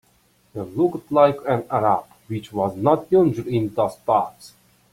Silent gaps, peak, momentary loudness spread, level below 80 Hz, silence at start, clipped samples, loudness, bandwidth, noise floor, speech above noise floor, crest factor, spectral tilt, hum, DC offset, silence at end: none; -2 dBFS; 14 LU; -58 dBFS; 0.55 s; under 0.1%; -21 LUFS; 16 kHz; -60 dBFS; 40 dB; 18 dB; -8 dB/octave; none; under 0.1%; 0.45 s